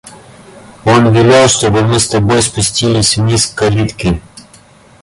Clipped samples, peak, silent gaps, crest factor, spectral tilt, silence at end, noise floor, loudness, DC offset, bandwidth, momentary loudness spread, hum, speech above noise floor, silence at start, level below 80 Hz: under 0.1%; 0 dBFS; none; 12 dB; -4.5 dB/octave; 0.65 s; -41 dBFS; -10 LUFS; under 0.1%; 11.5 kHz; 9 LU; none; 31 dB; 0.05 s; -34 dBFS